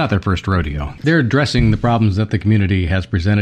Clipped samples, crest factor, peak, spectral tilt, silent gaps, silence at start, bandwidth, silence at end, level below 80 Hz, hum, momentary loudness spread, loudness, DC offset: under 0.1%; 12 dB; -2 dBFS; -7 dB/octave; none; 0 s; 9.2 kHz; 0 s; -30 dBFS; none; 5 LU; -16 LUFS; under 0.1%